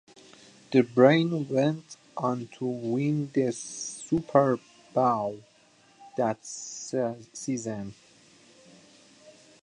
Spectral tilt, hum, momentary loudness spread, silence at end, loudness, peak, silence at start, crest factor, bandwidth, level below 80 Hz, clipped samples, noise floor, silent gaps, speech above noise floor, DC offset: -6 dB/octave; none; 15 LU; 1.7 s; -27 LUFS; -6 dBFS; 0.7 s; 24 dB; 10.5 kHz; -68 dBFS; under 0.1%; -60 dBFS; none; 34 dB; under 0.1%